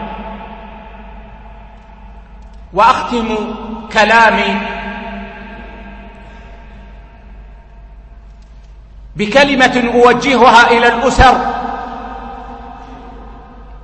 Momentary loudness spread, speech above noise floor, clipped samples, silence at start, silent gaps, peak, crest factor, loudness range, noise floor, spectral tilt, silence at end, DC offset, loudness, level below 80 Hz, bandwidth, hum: 26 LU; 26 dB; 0.2%; 0 s; none; 0 dBFS; 14 dB; 12 LU; -36 dBFS; -4.5 dB/octave; 0.05 s; under 0.1%; -11 LUFS; -30 dBFS; 11 kHz; none